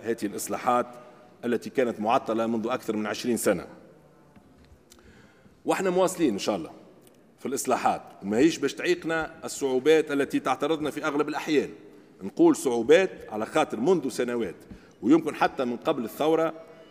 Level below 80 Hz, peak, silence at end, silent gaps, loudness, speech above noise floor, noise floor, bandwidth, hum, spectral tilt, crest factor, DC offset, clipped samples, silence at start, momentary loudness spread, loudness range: -66 dBFS; -6 dBFS; 0.05 s; none; -26 LUFS; 30 dB; -55 dBFS; 16 kHz; none; -4.5 dB/octave; 20 dB; under 0.1%; under 0.1%; 0 s; 12 LU; 5 LU